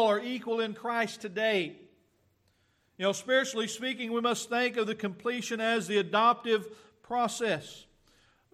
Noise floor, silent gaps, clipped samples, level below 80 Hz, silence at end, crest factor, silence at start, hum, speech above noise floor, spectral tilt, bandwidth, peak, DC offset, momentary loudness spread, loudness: -71 dBFS; none; under 0.1%; -76 dBFS; 0.7 s; 18 dB; 0 s; none; 41 dB; -3.5 dB/octave; 14.5 kHz; -12 dBFS; under 0.1%; 8 LU; -30 LUFS